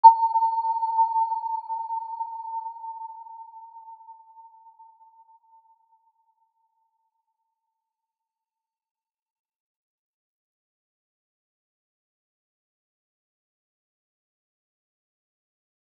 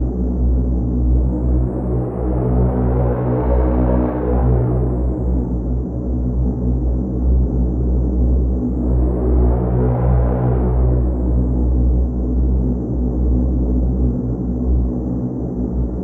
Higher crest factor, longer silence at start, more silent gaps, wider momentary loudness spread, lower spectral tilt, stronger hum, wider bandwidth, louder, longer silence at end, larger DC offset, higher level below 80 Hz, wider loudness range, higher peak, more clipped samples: first, 28 dB vs 12 dB; about the same, 0.05 s vs 0 s; neither; first, 23 LU vs 5 LU; second, -1 dB/octave vs -13 dB/octave; neither; first, 4.6 kHz vs 2.2 kHz; second, -25 LUFS vs -18 LUFS; first, 11.6 s vs 0 s; neither; second, under -90 dBFS vs -18 dBFS; first, 24 LU vs 2 LU; about the same, -2 dBFS vs -4 dBFS; neither